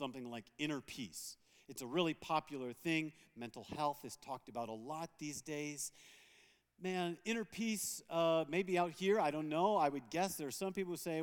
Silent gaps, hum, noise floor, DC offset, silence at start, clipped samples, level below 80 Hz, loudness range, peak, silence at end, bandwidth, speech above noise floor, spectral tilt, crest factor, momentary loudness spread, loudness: none; none; -70 dBFS; under 0.1%; 0 s; under 0.1%; -78 dBFS; 8 LU; -20 dBFS; 0 s; 19 kHz; 30 dB; -4 dB/octave; 20 dB; 14 LU; -40 LUFS